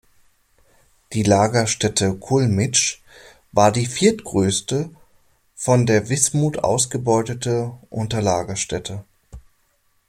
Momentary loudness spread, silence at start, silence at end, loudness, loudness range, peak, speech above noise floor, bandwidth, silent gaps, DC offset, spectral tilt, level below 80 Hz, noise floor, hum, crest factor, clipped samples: 11 LU; 1.1 s; 0.7 s; -20 LUFS; 3 LU; 0 dBFS; 44 dB; 15.5 kHz; none; under 0.1%; -4.5 dB/octave; -50 dBFS; -63 dBFS; none; 20 dB; under 0.1%